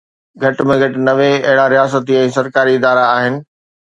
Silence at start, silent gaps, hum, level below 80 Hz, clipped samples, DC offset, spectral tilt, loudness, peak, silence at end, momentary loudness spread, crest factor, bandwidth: 0.4 s; none; none; -54 dBFS; under 0.1%; under 0.1%; -6 dB/octave; -13 LUFS; 0 dBFS; 0.45 s; 6 LU; 14 dB; 9.2 kHz